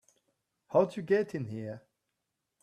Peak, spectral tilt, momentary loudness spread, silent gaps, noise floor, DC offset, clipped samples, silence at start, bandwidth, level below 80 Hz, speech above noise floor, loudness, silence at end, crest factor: -12 dBFS; -7.5 dB/octave; 14 LU; none; -85 dBFS; under 0.1%; under 0.1%; 0.7 s; 11 kHz; -76 dBFS; 55 dB; -31 LUFS; 0.85 s; 22 dB